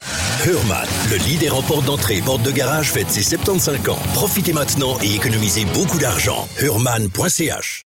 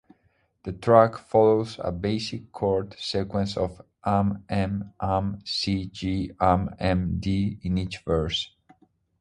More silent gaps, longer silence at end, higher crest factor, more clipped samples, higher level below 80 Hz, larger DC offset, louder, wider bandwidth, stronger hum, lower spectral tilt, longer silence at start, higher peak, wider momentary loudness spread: neither; second, 0.05 s vs 0.75 s; second, 10 dB vs 24 dB; neither; about the same, -38 dBFS vs -42 dBFS; neither; first, -17 LUFS vs -25 LUFS; first, 17.5 kHz vs 11 kHz; neither; second, -3.5 dB/octave vs -6.5 dB/octave; second, 0 s vs 0.65 s; second, -8 dBFS vs -2 dBFS; second, 2 LU vs 10 LU